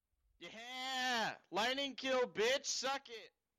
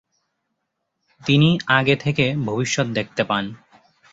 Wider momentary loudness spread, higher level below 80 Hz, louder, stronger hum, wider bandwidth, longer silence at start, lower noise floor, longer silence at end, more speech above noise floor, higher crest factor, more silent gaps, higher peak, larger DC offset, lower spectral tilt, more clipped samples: first, 18 LU vs 8 LU; second, -80 dBFS vs -54 dBFS; second, -38 LUFS vs -20 LUFS; neither; first, 15 kHz vs 7.8 kHz; second, 0.4 s vs 1.25 s; second, -58 dBFS vs -76 dBFS; second, 0.3 s vs 0.6 s; second, 20 dB vs 57 dB; second, 12 dB vs 20 dB; neither; second, -28 dBFS vs -2 dBFS; neither; second, -1 dB/octave vs -5 dB/octave; neither